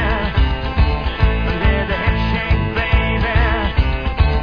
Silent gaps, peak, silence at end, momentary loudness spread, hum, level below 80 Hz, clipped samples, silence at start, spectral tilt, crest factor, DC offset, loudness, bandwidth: none; -2 dBFS; 0 s; 2 LU; none; -18 dBFS; under 0.1%; 0 s; -8 dB/octave; 14 dB; 0.5%; -18 LUFS; 5.4 kHz